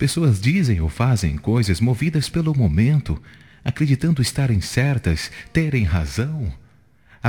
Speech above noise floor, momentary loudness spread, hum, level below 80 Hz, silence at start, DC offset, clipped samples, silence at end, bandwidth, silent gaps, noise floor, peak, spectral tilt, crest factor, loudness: 34 dB; 7 LU; none; -36 dBFS; 0 s; 0.1%; under 0.1%; 0 s; 18 kHz; none; -53 dBFS; -4 dBFS; -6 dB/octave; 16 dB; -20 LUFS